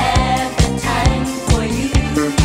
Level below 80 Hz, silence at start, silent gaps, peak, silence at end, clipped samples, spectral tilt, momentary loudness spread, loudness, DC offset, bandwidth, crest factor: -22 dBFS; 0 s; none; 0 dBFS; 0 s; under 0.1%; -5 dB/octave; 2 LU; -17 LUFS; under 0.1%; 16 kHz; 16 dB